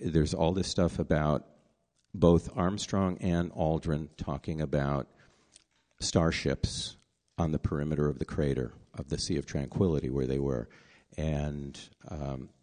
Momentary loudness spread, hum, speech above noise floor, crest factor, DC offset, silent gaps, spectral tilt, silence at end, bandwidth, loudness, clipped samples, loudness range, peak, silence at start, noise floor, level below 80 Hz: 12 LU; none; 43 dB; 20 dB; under 0.1%; none; -6 dB/octave; 0.15 s; 10 kHz; -31 LUFS; under 0.1%; 4 LU; -10 dBFS; 0 s; -73 dBFS; -44 dBFS